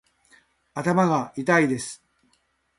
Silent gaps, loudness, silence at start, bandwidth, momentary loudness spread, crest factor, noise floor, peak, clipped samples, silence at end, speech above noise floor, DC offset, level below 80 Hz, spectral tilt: none; -23 LUFS; 0.75 s; 11.5 kHz; 16 LU; 20 dB; -68 dBFS; -6 dBFS; under 0.1%; 0.85 s; 46 dB; under 0.1%; -64 dBFS; -6 dB/octave